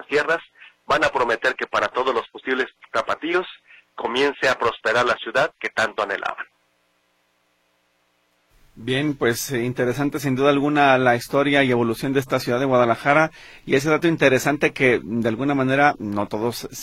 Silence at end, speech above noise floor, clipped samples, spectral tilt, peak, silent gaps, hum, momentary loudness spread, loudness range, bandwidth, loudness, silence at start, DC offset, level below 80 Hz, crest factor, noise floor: 0 s; 46 dB; under 0.1%; -5 dB/octave; -2 dBFS; none; none; 8 LU; 8 LU; 16.5 kHz; -21 LUFS; 0 s; under 0.1%; -54 dBFS; 20 dB; -66 dBFS